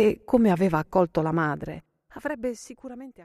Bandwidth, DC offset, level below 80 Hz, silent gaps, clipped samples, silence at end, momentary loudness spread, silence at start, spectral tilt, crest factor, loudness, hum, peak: 14 kHz; under 0.1%; -52 dBFS; none; under 0.1%; 0.05 s; 19 LU; 0 s; -7.5 dB/octave; 18 dB; -25 LUFS; none; -6 dBFS